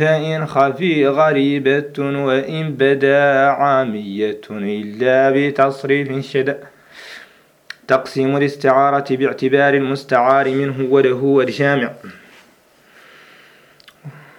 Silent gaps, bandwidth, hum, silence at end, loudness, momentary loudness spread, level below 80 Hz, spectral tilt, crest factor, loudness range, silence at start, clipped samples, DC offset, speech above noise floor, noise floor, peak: none; 11.5 kHz; none; 0.2 s; -16 LUFS; 10 LU; -66 dBFS; -7 dB/octave; 16 dB; 4 LU; 0 s; under 0.1%; under 0.1%; 36 dB; -51 dBFS; 0 dBFS